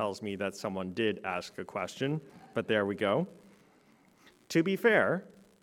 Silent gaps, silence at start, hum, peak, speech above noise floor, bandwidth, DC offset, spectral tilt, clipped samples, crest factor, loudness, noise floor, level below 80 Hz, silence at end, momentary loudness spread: none; 0 s; none; -12 dBFS; 32 dB; 17.5 kHz; under 0.1%; -5.5 dB/octave; under 0.1%; 20 dB; -32 LUFS; -63 dBFS; -76 dBFS; 0.35 s; 12 LU